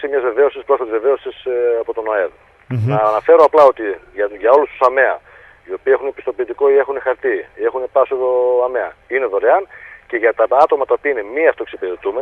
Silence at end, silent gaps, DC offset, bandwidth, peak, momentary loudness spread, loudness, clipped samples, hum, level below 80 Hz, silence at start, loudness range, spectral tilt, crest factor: 0 s; none; under 0.1%; 6.2 kHz; 0 dBFS; 11 LU; -16 LUFS; under 0.1%; none; -56 dBFS; 0 s; 4 LU; -8 dB/octave; 16 dB